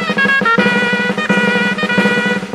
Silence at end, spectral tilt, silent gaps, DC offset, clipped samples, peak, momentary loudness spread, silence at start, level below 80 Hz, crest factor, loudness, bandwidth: 0 s; -5 dB/octave; none; under 0.1%; under 0.1%; 0 dBFS; 3 LU; 0 s; -54 dBFS; 14 dB; -13 LUFS; 12.5 kHz